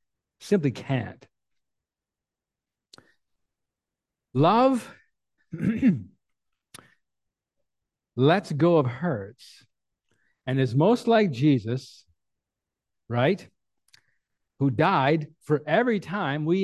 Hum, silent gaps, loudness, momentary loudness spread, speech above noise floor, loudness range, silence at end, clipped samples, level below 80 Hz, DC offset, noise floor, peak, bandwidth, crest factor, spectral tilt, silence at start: none; none; -24 LUFS; 12 LU; 66 dB; 7 LU; 0 s; under 0.1%; -64 dBFS; under 0.1%; -90 dBFS; -6 dBFS; 12.5 kHz; 20 dB; -7.5 dB/octave; 0.4 s